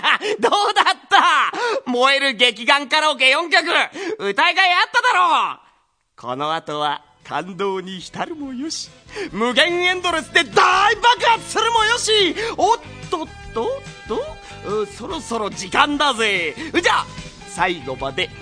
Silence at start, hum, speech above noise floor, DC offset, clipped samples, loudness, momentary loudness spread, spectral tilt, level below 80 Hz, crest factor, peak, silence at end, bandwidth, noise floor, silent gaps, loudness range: 0 s; none; 41 dB; under 0.1%; under 0.1%; -17 LUFS; 14 LU; -2 dB/octave; -50 dBFS; 20 dB; 0 dBFS; 0 s; 10.5 kHz; -60 dBFS; none; 9 LU